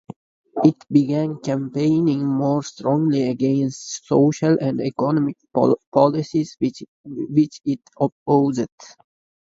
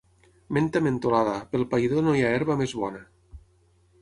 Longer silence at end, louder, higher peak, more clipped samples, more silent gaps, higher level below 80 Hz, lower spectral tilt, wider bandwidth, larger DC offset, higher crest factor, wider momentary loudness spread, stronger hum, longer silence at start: about the same, 0.55 s vs 0.65 s; first, -20 LUFS vs -25 LUFS; first, 0 dBFS vs -8 dBFS; neither; first, 5.87-5.92 s, 6.88-7.04 s, 8.12-8.26 s, 8.72-8.78 s vs none; second, -62 dBFS vs -54 dBFS; about the same, -7.5 dB/octave vs -7 dB/octave; second, 7.8 kHz vs 11 kHz; neither; about the same, 20 dB vs 18 dB; about the same, 9 LU vs 8 LU; neither; about the same, 0.55 s vs 0.5 s